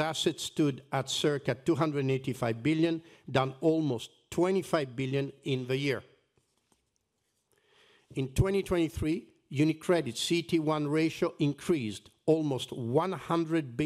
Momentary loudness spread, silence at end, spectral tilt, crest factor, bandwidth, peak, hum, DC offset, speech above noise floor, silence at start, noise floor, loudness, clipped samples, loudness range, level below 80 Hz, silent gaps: 6 LU; 0 s; -5.5 dB/octave; 18 dB; 15 kHz; -12 dBFS; none; under 0.1%; 49 dB; 0 s; -79 dBFS; -31 LUFS; under 0.1%; 5 LU; -54 dBFS; none